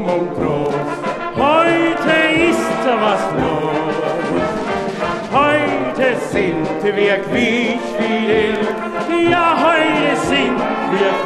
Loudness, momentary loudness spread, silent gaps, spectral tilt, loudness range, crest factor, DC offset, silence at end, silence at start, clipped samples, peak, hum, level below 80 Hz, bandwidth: -16 LUFS; 7 LU; none; -5 dB/octave; 2 LU; 14 dB; under 0.1%; 0 s; 0 s; under 0.1%; -2 dBFS; none; -44 dBFS; 13 kHz